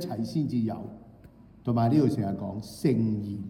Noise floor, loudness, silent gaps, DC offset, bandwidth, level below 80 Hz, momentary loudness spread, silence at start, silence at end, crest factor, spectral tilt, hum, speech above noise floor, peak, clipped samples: -52 dBFS; -28 LUFS; none; under 0.1%; 16 kHz; -60 dBFS; 13 LU; 0 s; 0 s; 16 dB; -8.5 dB/octave; none; 25 dB; -12 dBFS; under 0.1%